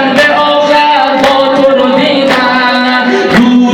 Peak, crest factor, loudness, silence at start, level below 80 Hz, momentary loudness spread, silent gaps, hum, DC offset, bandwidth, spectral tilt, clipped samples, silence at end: 0 dBFS; 8 dB; -7 LUFS; 0 s; -42 dBFS; 2 LU; none; none; under 0.1%; 14 kHz; -4.5 dB/octave; 1%; 0 s